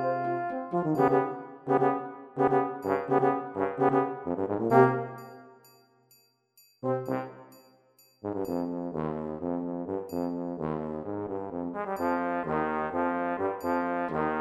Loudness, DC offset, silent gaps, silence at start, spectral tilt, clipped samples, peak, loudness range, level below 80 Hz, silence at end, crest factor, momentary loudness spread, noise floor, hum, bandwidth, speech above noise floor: -29 LUFS; under 0.1%; none; 0 s; -8.5 dB/octave; under 0.1%; -6 dBFS; 9 LU; -64 dBFS; 0 s; 24 dB; 10 LU; -65 dBFS; none; 13.5 kHz; 39 dB